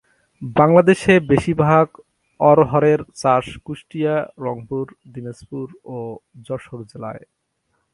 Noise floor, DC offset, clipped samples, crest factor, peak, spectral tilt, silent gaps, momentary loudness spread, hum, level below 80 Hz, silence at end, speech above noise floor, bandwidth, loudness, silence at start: -70 dBFS; under 0.1%; under 0.1%; 18 dB; 0 dBFS; -7 dB/octave; none; 20 LU; none; -50 dBFS; 0.75 s; 52 dB; 11.5 kHz; -17 LUFS; 0.4 s